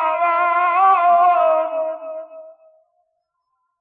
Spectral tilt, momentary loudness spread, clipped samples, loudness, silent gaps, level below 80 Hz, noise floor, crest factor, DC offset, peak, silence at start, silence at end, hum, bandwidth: -6 dB/octave; 16 LU; under 0.1%; -16 LUFS; none; -74 dBFS; -72 dBFS; 14 dB; under 0.1%; -6 dBFS; 0 s; 1.3 s; none; 4.5 kHz